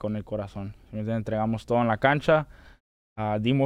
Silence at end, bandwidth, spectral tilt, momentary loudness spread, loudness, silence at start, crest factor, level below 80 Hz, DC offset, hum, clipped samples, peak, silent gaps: 0 s; 10.5 kHz; -8 dB/octave; 15 LU; -26 LUFS; 0 s; 20 dB; -50 dBFS; under 0.1%; none; under 0.1%; -8 dBFS; 2.80-3.16 s